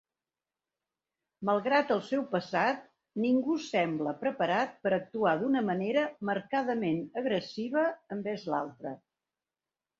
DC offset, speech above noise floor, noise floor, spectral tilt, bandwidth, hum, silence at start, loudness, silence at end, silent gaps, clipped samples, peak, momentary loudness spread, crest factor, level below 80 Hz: under 0.1%; over 60 dB; under -90 dBFS; -6.5 dB/octave; 7.8 kHz; none; 1.4 s; -31 LUFS; 1.05 s; none; under 0.1%; -12 dBFS; 9 LU; 18 dB; -76 dBFS